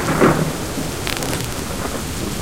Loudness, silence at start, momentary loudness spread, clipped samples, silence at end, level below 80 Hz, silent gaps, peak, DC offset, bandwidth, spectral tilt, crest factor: -21 LUFS; 0 s; 9 LU; under 0.1%; 0 s; -34 dBFS; none; 0 dBFS; 2%; 17 kHz; -4.5 dB/octave; 20 dB